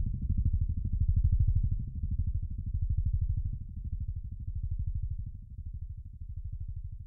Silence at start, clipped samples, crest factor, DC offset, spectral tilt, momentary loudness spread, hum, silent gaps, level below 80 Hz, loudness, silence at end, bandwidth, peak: 0 s; under 0.1%; 16 dB; under 0.1%; -17.5 dB/octave; 14 LU; none; none; -34 dBFS; -35 LUFS; 0 s; 0.5 kHz; -16 dBFS